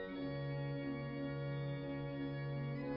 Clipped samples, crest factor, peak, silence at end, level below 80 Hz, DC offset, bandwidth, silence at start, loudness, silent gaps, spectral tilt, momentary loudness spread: under 0.1%; 10 dB; -32 dBFS; 0 s; -64 dBFS; under 0.1%; 5.4 kHz; 0 s; -43 LUFS; none; -7 dB/octave; 1 LU